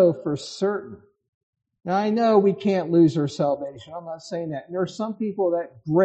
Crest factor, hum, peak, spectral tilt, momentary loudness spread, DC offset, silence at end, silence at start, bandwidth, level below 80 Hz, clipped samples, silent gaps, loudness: 16 dB; none; -6 dBFS; -7.5 dB/octave; 16 LU; under 0.1%; 0 s; 0 s; 8.6 kHz; -66 dBFS; under 0.1%; 1.28-1.53 s; -23 LUFS